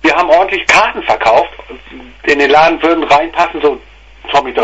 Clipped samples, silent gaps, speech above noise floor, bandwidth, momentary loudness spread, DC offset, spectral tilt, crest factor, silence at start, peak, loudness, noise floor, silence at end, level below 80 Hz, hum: 0.1%; none; 22 dB; 11 kHz; 18 LU; under 0.1%; -3 dB/octave; 12 dB; 0.05 s; 0 dBFS; -10 LUFS; -33 dBFS; 0 s; -40 dBFS; none